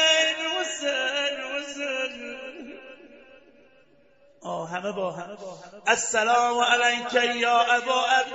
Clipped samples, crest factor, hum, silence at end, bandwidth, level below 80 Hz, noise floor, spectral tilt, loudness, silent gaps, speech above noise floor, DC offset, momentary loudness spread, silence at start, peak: under 0.1%; 20 dB; none; 0 s; 8.2 kHz; -70 dBFS; -59 dBFS; -1 dB/octave; -24 LUFS; none; 35 dB; under 0.1%; 18 LU; 0 s; -6 dBFS